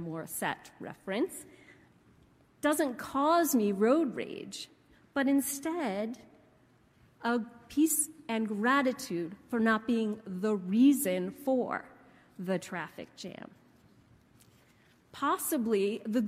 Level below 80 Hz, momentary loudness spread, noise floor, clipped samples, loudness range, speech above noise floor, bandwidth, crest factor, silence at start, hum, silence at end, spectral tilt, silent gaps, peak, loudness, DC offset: -72 dBFS; 17 LU; -64 dBFS; under 0.1%; 8 LU; 34 dB; 16 kHz; 18 dB; 0 s; none; 0 s; -4.5 dB/octave; none; -16 dBFS; -31 LUFS; under 0.1%